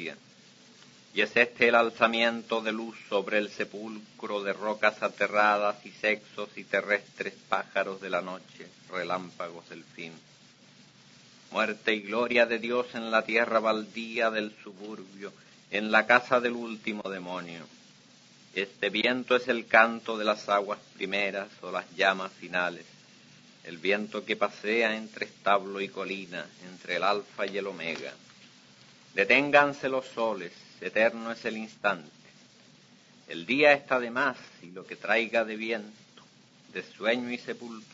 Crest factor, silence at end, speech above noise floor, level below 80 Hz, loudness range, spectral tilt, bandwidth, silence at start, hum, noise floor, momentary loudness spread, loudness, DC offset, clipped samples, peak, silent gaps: 26 dB; 0.1 s; 28 dB; -78 dBFS; 6 LU; -4 dB/octave; 7.8 kHz; 0 s; none; -57 dBFS; 19 LU; -28 LUFS; under 0.1%; under 0.1%; -4 dBFS; none